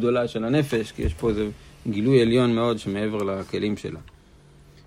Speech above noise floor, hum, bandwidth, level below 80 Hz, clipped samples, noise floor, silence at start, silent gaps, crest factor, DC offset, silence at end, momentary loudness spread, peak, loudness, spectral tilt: 28 dB; none; 15.5 kHz; -42 dBFS; under 0.1%; -51 dBFS; 0 s; none; 18 dB; under 0.1%; 0.85 s; 12 LU; -6 dBFS; -24 LUFS; -7 dB/octave